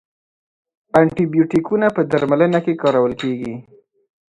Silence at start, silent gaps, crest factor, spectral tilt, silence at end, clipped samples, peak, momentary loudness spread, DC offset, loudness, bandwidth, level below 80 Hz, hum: 0.95 s; none; 18 dB; -8 dB/octave; 0.7 s; under 0.1%; 0 dBFS; 8 LU; under 0.1%; -17 LUFS; 10.5 kHz; -54 dBFS; none